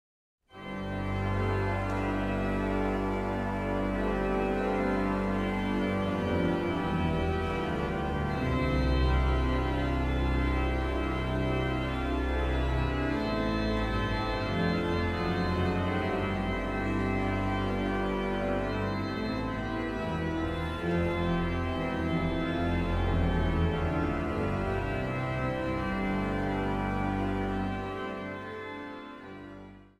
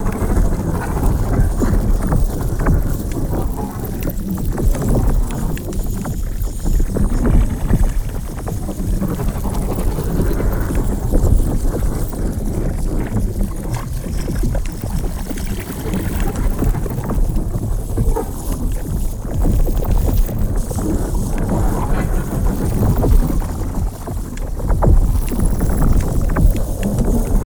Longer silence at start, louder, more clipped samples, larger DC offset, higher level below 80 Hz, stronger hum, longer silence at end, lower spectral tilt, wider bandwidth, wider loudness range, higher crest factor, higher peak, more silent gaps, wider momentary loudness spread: first, 0.55 s vs 0 s; second, -30 LUFS vs -20 LUFS; neither; neither; second, -36 dBFS vs -18 dBFS; neither; first, 0.15 s vs 0 s; about the same, -7.5 dB/octave vs -7 dB/octave; second, 12.5 kHz vs over 20 kHz; about the same, 2 LU vs 3 LU; about the same, 14 dB vs 16 dB; second, -16 dBFS vs 0 dBFS; neither; second, 4 LU vs 7 LU